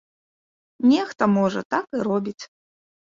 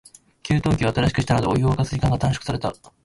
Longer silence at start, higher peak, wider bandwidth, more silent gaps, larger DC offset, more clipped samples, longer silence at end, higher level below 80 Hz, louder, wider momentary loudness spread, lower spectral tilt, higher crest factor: first, 0.8 s vs 0.45 s; about the same, -4 dBFS vs -6 dBFS; second, 7.6 kHz vs 11.5 kHz; first, 1.65-1.70 s vs none; neither; neither; first, 0.6 s vs 0.3 s; second, -66 dBFS vs -38 dBFS; about the same, -22 LUFS vs -22 LUFS; first, 15 LU vs 7 LU; about the same, -6.5 dB/octave vs -6.5 dB/octave; about the same, 20 dB vs 16 dB